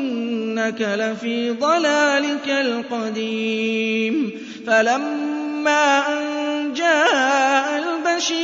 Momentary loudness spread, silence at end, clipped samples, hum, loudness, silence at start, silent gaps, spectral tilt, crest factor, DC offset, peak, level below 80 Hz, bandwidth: 8 LU; 0 s; under 0.1%; none; -20 LUFS; 0 s; none; -3 dB/octave; 16 dB; under 0.1%; -4 dBFS; -74 dBFS; 7.8 kHz